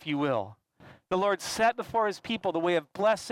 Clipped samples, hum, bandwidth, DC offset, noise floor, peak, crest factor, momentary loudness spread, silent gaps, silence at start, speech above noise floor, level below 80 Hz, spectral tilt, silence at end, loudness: under 0.1%; none; 16.5 kHz; under 0.1%; -56 dBFS; -14 dBFS; 16 dB; 6 LU; none; 0 s; 27 dB; -66 dBFS; -4.5 dB/octave; 0 s; -29 LUFS